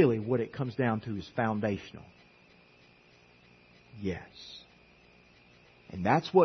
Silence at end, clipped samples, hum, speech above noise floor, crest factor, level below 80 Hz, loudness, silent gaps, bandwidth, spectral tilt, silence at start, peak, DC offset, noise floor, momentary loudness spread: 0 s; under 0.1%; none; 31 dB; 24 dB; -66 dBFS; -32 LUFS; none; 6.4 kHz; -8 dB/octave; 0 s; -10 dBFS; under 0.1%; -60 dBFS; 20 LU